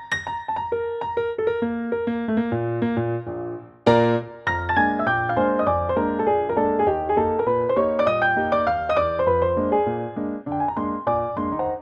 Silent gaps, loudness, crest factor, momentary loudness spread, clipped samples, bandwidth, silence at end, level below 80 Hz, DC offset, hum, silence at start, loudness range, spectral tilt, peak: none; -22 LUFS; 20 dB; 7 LU; under 0.1%; 8.4 kHz; 0 s; -48 dBFS; under 0.1%; none; 0 s; 4 LU; -7.5 dB/octave; -2 dBFS